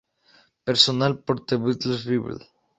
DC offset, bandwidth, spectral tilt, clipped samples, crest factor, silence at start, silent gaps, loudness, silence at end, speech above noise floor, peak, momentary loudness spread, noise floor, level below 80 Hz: under 0.1%; 8.4 kHz; -5 dB/octave; under 0.1%; 22 dB; 0.65 s; none; -22 LUFS; 0.4 s; 36 dB; -2 dBFS; 15 LU; -59 dBFS; -60 dBFS